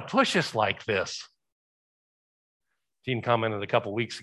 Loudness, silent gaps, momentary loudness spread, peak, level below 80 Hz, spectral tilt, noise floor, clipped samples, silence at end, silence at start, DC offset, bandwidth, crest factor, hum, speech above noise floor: -27 LUFS; 1.52-2.60 s; 10 LU; -6 dBFS; -64 dBFS; -4.5 dB/octave; under -90 dBFS; under 0.1%; 0 s; 0 s; under 0.1%; 12.5 kHz; 22 dB; none; over 63 dB